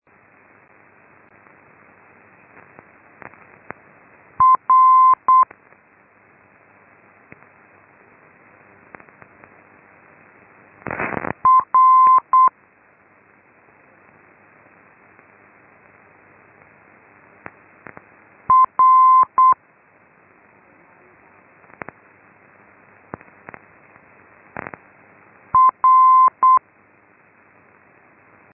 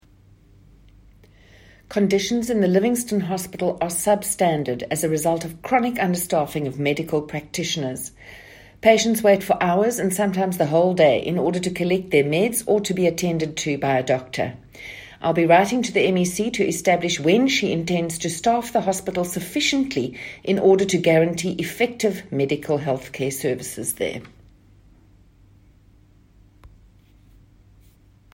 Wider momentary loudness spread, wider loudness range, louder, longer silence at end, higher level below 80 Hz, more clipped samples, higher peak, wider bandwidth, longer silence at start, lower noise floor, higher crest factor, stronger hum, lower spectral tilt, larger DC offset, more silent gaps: first, 27 LU vs 10 LU; about the same, 7 LU vs 6 LU; first, -14 LUFS vs -21 LUFS; second, 1.95 s vs 4.05 s; second, -62 dBFS vs -54 dBFS; neither; second, -6 dBFS vs -2 dBFS; second, 2.8 kHz vs 16.5 kHz; first, 4.4 s vs 1.9 s; about the same, -54 dBFS vs -53 dBFS; about the same, 16 dB vs 20 dB; neither; first, -9.5 dB/octave vs -4.5 dB/octave; neither; neither